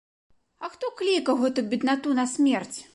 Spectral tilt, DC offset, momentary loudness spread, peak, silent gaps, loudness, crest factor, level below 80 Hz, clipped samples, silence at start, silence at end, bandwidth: -3.5 dB/octave; under 0.1%; 10 LU; -12 dBFS; none; -25 LUFS; 14 dB; -72 dBFS; under 0.1%; 0.6 s; 0.1 s; 11.5 kHz